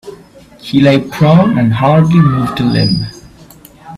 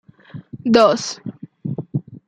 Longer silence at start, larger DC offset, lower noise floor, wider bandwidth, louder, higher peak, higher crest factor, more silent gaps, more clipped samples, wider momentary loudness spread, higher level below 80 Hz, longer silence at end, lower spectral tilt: second, 0.05 s vs 0.35 s; neither; about the same, -38 dBFS vs -39 dBFS; first, 13.5 kHz vs 10.5 kHz; first, -10 LUFS vs -18 LUFS; about the same, 0 dBFS vs -2 dBFS; second, 12 dB vs 18 dB; neither; neither; second, 8 LU vs 24 LU; first, -40 dBFS vs -58 dBFS; about the same, 0 s vs 0.1 s; first, -8 dB/octave vs -5.5 dB/octave